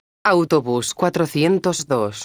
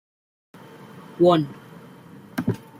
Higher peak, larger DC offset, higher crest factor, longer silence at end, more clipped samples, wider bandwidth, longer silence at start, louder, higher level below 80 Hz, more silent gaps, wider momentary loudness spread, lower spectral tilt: first, -2 dBFS vs -6 dBFS; neither; about the same, 16 dB vs 20 dB; second, 0 s vs 0.2 s; neither; first, over 20 kHz vs 15 kHz; second, 0.25 s vs 0.95 s; first, -19 LUFS vs -22 LUFS; about the same, -60 dBFS vs -64 dBFS; neither; second, 4 LU vs 27 LU; second, -5 dB/octave vs -7.5 dB/octave